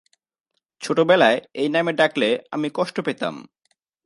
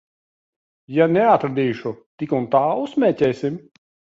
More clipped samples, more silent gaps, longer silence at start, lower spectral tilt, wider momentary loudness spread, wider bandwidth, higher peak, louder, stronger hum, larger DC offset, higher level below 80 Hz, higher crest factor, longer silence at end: neither; second, none vs 2.06-2.18 s; about the same, 0.8 s vs 0.9 s; second, -5 dB/octave vs -8 dB/octave; about the same, 13 LU vs 13 LU; first, 11.5 kHz vs 7.8 kHz; about the same, 0 dBFS vs -2 dBFS; about the same, -21 LUFS vs -19 LUFS; neither; neither; second, -74 dBFS vs -62 dBFS; about the same, 22 dB vs 18 dB; about the same, 0.65 s vs 0.6 s